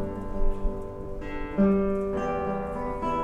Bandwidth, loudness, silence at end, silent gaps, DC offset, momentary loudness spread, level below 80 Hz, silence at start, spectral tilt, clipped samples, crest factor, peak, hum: 6.6 kHz; -29 LUFS; 0 s; none; under 0.1%; 13 LU; -32 dBFS; 0 s; -9 dB/octave; under 0.1%; 14 dB; -12 dBFS; none